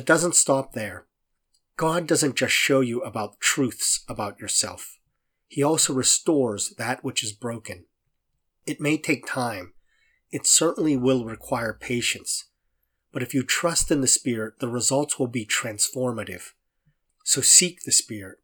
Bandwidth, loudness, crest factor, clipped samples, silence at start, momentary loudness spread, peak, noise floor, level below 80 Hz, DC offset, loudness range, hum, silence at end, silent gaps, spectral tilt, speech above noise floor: over 20 kHz; -22 LUFS; 24 dB; under 0.1%; 0 s; 16 LU; -2 dBFS; -75 dBFS; -52 dBFS; under 0.1%; 5 LU; none; 0.1 s; none; -2.5 dB/octave; 51 dB